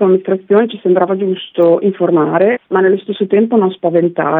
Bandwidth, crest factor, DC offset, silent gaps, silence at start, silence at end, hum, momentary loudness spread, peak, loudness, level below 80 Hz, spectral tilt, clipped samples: 4 kHz; 12 dB; under 0.1%; none; 0 s; 0 s; none; 3 LU; 0 dBFS; -13 LUFS; -66 dBFS; -10.5 dB/octave; under 0.1%